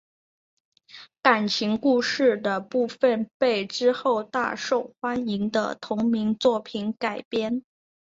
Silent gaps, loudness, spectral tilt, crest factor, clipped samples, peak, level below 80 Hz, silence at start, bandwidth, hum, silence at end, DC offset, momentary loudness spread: 3.34-3.40 s, 7.25-7.31 s; -25 LUFS; -4.5 dB/octave; 22 dB; under 0.1%; -2 dBFS; -66 dBFS; 0.95 s; 7.8 kHz; none; 0.5 s; under 0.1%; 7 LU